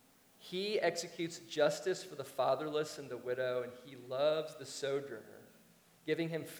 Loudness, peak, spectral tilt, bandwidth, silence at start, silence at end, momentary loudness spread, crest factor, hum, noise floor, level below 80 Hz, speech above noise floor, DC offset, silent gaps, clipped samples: -37 LUFS; -18 dBFS; -4 dB/octave; over 20 kHz; 0.4 s; 0 s; 14 LU; 20 dB; none; -65 dBFS; -86 dBFS; 28 dB; under 0.1%; none; under 0.1%